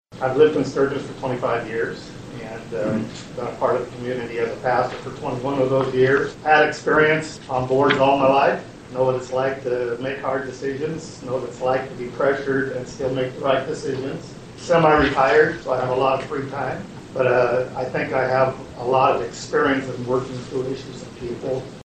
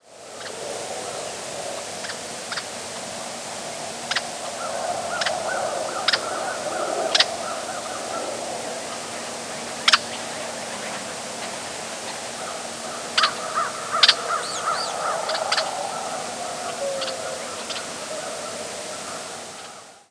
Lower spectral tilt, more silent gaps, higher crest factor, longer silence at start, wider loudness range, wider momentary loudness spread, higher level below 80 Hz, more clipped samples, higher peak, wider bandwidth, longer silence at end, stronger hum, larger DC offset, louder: first, -6 dB/octave vs -0.5 dB/octave; neither; second, 20 dB vs 26 dB; about the same, 0.1 s vs 0.05 s; about the same, 7 LU vs 8 LU; first, 14 LU vs 11 LU; first, -48 dBFS vs -68 dBFS; neither; about the same, -2 dBFS vs 0 dBFS; second, 9.2 kHz vs 11 kHz; about the same, 0.05 s vs 0.1 s; neither; neither; first, -21 LUFS vs -25 LUFS